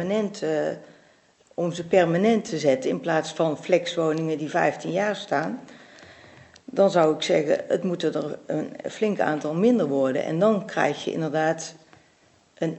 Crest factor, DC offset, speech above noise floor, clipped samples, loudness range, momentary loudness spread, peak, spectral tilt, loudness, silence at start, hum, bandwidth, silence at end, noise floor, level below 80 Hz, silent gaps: 18 dB; under 0.1%; 36 dB; under 0.1%; 2 LU; 10 LU; -6 dBFS; -5.5 dB/octave; -24 LUFS; 0 s; none; 8.4 kHz; 0 s; -60 dBFS; -72 dBFS; none